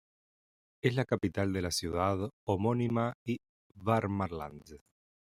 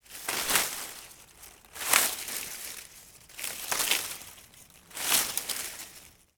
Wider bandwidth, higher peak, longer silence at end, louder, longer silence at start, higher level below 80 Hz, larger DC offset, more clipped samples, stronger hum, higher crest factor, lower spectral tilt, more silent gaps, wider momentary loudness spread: second, 15.5 kHz vs over 20 kHz; second, -12 dBFS vs 0 dBFS; first, 0.55 s vs 0.25 s; second, -33 LUFS vs -28 LUFS; first, 0.85 s vs 0.1 s; about the same, -62 dBFS vs -64 dBFS; neither; neither; neither; second, 20 dB vs 32 dB; first, -6 dB/octave vs 1 dB/octave; first, 2.33-2.47 s, 3.15-3.26 s, 3.49-3.70 s vs none; second, 9 LU vs 24 LU